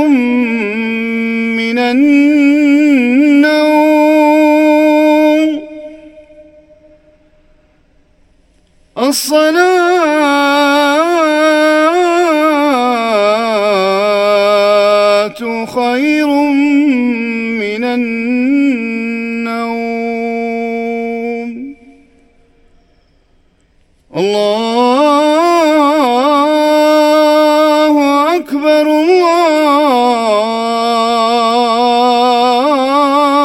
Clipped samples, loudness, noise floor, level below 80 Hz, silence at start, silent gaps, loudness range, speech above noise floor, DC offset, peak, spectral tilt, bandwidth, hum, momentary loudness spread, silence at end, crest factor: under 0.1%; -11 LUFS; -52 dBFS; -54 dBFS; 0 s; none; 10 LU; 43 dB; under 0.1%; 0 dBFS; -4 dB/octave; 17 kHz; none; 9 LU; 0 s; 12 dB